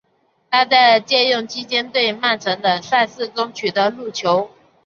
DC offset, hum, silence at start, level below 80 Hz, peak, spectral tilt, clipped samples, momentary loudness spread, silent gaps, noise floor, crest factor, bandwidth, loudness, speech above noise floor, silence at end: under 0.1%; none; 0.5 s; -68 dBFS; -2 dBFS; -3 dB/octave; under 0.1%; 10 LU; none; -63 dBFS; 16 dB; 7.2 kHz; -17 LUFS; 45 dB; 0.4 s